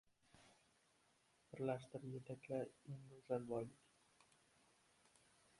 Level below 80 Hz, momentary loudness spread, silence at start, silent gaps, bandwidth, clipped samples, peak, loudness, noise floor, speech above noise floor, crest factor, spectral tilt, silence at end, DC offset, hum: -84 dBFS; 11 LU; 0.35 s; none; 11.5 kHz; under 0.1%; -30 dBFS; -49 LUFS; -78 dBFS; 30 dB; 22 dB; -7.5 dB/octave; 1.85 s; under 0.1%; none